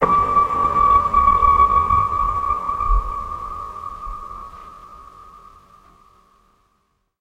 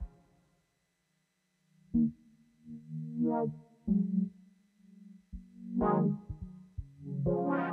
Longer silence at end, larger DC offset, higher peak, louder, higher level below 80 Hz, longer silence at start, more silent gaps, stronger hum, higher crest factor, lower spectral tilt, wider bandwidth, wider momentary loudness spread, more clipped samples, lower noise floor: first, 2 s vs 0 s; neither; first, -2 dBFS vs -16 dBFS; first, -17 LUFS vs -33 LUFS; first, -30 dBFS vs -54 dBFS; about the same, 0 s vs 0 s; neither; neither; about the same, 18 dB vs 18 dB; second, -7 dB/octave vs -11 dB/octave; first, 8.4 kHz vs 3.5 kHz; about the same, 20 LU vs 20 LU; neither; second, -67 dBFS vs -78 dBFS